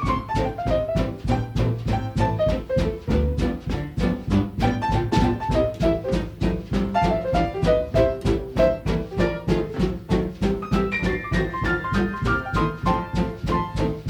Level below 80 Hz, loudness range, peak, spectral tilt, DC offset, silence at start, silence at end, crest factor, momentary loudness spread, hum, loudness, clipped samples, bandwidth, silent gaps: -30 dBFS; 2 LU; -6 dBFS; -7.5 dB/octave; under 0.1%; 0 s; 0 s; 16 dB; 5 LU; none; -23 LUFS; under 0.1%; 17 kHz; none